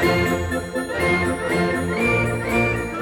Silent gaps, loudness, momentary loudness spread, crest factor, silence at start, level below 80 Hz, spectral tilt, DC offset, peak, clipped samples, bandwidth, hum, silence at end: none; -21 LUFS; 5 LU; 12 dB; 0 s; -38 dBFS; -5.5 dB/octave; under 0.1%; -8 dBFS; under 0.1%; 19.5 kHz; none; 0 s